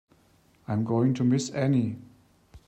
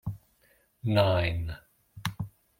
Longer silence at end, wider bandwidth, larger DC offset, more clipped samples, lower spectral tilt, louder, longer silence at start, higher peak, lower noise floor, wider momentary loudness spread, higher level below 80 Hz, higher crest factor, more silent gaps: second, 0.1 s vs 0.3 s; second, 9 kHz vs 16.5 kHz; neither; neither; about the same, -7 dB/octave vs -6.5 dB/octave; first, -26 LUFS vs -29 LUFS; first, 0.7 s vs 0.05 s; second, -14 dBFS vs -10 dBFS; second, -62 dBFS vs -66 dBFS; second, 13 LU vs 18 LU; second, -62 dBFS vs -50 dBFS; second, 14 dB vs 22 dB; neither